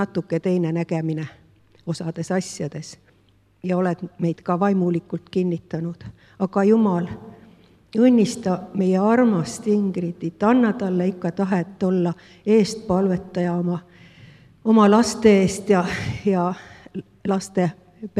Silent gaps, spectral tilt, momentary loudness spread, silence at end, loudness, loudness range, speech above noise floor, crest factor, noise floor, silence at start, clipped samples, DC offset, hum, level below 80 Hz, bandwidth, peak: none; -7 dB/octave; 15 LU; 0 s; -21 LUFS; 7 LU; 38 dB; 20 dB; -58 dBFS; 0 s; under 0.1%; under 0.1%; none; -56 dBFS; 12 kHz; -2 dBFS